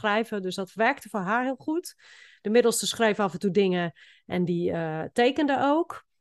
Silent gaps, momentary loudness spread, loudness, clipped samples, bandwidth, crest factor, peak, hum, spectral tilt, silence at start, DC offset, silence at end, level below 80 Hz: none; 10 LU; -26 LUFS; under 0.1%; 12.5 kHz; 18 dB; -8 dBFS; none; -4.5 dB/octave; 0 s; under 0.1%; 0.2 s; -68 dBFS